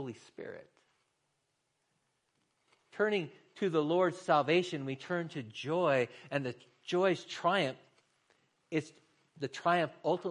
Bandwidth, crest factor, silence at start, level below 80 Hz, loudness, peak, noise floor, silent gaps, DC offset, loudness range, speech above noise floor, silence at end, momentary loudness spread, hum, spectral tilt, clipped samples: 11 kHz; 20 dB; 0 s; -84 dBFS; -33 LUFS; -14 dBFS; -81 dBFS; none; under 0.1%; 7 LU; 48 dB; 0 s; 18 LU; none; -5.5 dB/octave; under 0.1%